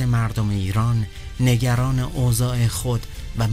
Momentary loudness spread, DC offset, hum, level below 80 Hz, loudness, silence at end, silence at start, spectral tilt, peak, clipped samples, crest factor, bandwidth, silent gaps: 6 LU; under 0.1%; none; -34 dBFS; -22 LUFS; 0 s; 0 s; -6 dB/octave; -6 dBFS; under 0.1%; 14 dB; 16 kHz; none